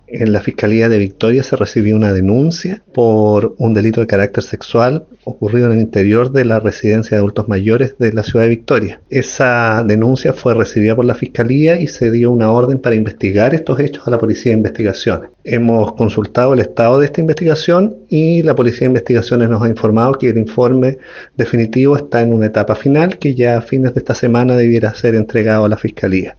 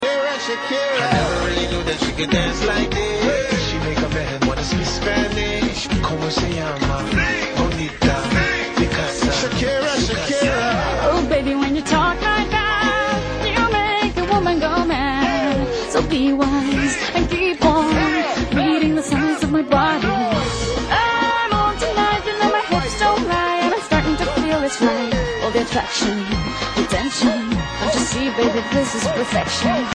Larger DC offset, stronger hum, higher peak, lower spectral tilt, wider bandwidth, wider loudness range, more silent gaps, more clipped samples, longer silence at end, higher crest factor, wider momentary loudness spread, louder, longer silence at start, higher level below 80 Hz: neither; neither; about the same, 0 dBFS vs -2 dBFS; first, -7.5 dB/octave vs -4.5 dB/octave; second, 7 kHz vs 10.5 kHz; about the same, 1 LU vs 2 LU; neither; neither; about the same, 0.05 s vs 0 s; second, 12 dB vs 18 dB; about the same, 5 LU vs 4 LU; first, -13 LUFS vs -19 LUFS; about the same, 0.1 s vs 0 s; second, -46 dBFS vs -32 dBFS